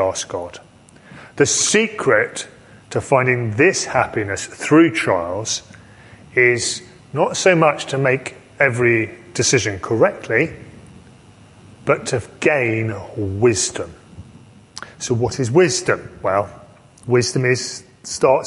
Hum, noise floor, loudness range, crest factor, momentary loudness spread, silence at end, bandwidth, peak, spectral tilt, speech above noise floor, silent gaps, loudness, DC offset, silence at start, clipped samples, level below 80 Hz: none; -46 dBFS; 4 LU; 18 dB; 14 LU; 0 s; 11.5 kHz; 0 dBFS; -4 dB/octave; 28 dB; none; -18 LUFS; under 0.1%; 0 s; under 0.1%; -48 dBFS